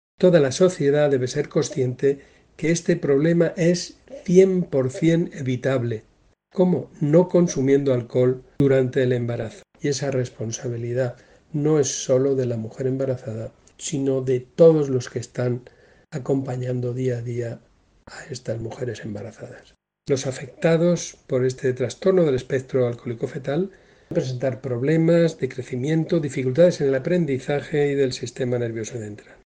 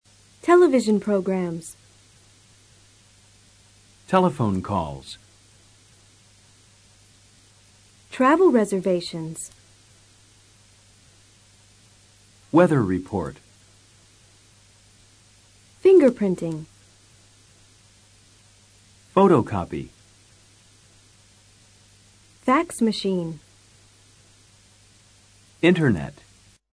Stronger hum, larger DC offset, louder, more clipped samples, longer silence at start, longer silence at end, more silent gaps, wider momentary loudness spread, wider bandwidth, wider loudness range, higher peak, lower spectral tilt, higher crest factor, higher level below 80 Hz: neither; neither; about the same, -22 LUFS vs -21 LUFS; neither; second, 0.2 s vs 0.45 s; second, 0.4 s vs 0.6 s; neither; second, 14 LU vs 19 LU; second, 9.8 kHz vs 11 kHz; about the same, 7 LU vs 7 LU; about the same, -2 dBFS vs -4 dBFS; about the same, -6.5 dB/octave vs -6.5 dB/octave; about the same, 20 dB vs 22 dB; about the same, -56 dBFS vs -56 dBFS